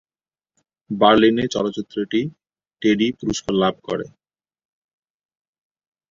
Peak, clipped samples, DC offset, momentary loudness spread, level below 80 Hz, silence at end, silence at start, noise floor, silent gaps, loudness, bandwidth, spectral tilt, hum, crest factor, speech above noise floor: -2 dBFS; under 0.1%; under 0.1%; 14 LU; -54 dBFS; 2.05 s; 0.9 s; under -90 dBFS; none; -20 LUFS; 7.6 kHz; -5 dB/octave; none; 20 dB; over 71 dB